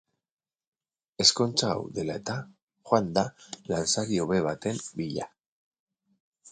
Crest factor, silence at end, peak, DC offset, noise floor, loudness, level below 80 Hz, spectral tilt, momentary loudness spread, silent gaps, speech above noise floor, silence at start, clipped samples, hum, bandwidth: 24 dB; 0 s; -6 dBFS; under 0.1%; under -90 dBFS; -27 LUFS; -60 dBFS; -3.5 dB/octave; 13 LU; 2.62-2.67 s, 5.46-5.71 s, 5.79-5.87 s, 6.20-6.33 s; over 62 dB; 1.2 s; under 0.1%; none; 9.6 kHz